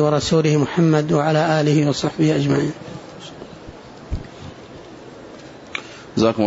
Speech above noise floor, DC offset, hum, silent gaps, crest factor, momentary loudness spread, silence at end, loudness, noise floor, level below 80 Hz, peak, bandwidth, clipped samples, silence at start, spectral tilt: 22 dB; under 0.1%; none; none; 16 dB; 22 LU; 0 s; -18 LUFS; -39 dBFS; -42 dBFS; -4 dBFS; 8 kHz; under 0.1%; 0 s; -6.5 dB/octave